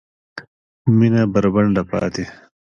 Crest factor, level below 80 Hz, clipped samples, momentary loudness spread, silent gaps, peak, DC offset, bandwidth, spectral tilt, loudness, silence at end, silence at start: 16 dB; -46 dBFS; under 0.1%; 23 LU; 0.47-0.85 s; -2 dBFS; under 0.1%; 7 kHz; -8 dB/octave; -17 LUFS; 0.4 s; 0.35 s